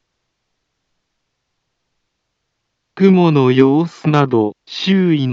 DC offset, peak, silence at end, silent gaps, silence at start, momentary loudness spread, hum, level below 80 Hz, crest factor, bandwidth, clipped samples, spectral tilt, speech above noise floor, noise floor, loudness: under 0.1%; 0 dBFS; 0 s; none; 2.95 s; 6 LU; none; -68 dBFS; 16 dB; 7.2 kHz; under 0.1%; -8 dB/octave; 60 dB; -73 dBFS; -14 LUFS